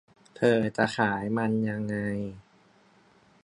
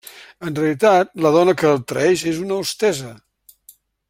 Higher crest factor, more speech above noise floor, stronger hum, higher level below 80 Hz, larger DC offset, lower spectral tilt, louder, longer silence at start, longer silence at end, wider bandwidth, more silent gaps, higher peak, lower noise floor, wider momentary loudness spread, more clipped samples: first, 22 dB vs 16 dB; about the same, 34 dB vs 34 dB; neither; about the same, -62 dBFS vs -60 dBFS; neither; first, -6.5 dB/octave vs -5 dB/octave; second, -27 LUFS vs -18 LUFS; first, 0.35 s vs 0.15 s; about the same, 1.05 s vs 0.95 s; second, 10.5 kHz vs 16.5 kHz; neither; second, -8 dBFS vs -2 dBFS; first, -61 dBFS vs -51 dBFS; second, 8 LU vs 13 LU; neither